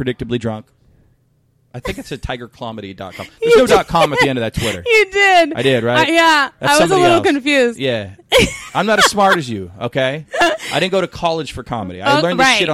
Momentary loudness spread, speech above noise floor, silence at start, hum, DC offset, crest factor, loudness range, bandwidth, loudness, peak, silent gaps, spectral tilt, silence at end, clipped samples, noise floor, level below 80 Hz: 16 LU; 43 dB; 0 s; none; under 0.1%; 14 dB; 6 LU; 16.5 kHz; -14 LUFS; 0 dBFS; none; -4 dB/octave; 0 s; under 0.1%; -58 dBFS; -40 dBFS